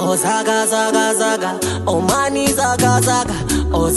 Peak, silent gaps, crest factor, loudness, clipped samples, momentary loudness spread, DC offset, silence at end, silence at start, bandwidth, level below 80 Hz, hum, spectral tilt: -2 dBFS; none; 14 dB; -16 LUFS; under 0.1%; 5 LU; under 0.1%; 0 s; 0 s; 13 kHz; -32 dBFS; none; -4 dB/octave